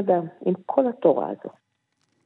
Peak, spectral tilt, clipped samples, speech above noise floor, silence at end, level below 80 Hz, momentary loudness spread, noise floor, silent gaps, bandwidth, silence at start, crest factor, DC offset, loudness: -6 dBFS; -11 dB/octave; under 0.1%; 49 dB; 0.75 s; -82 dBFS; 14 LU; -72 dBFS; none; 4 kHz; 0 s; 20 dB; under 0.1%; -23 LUFS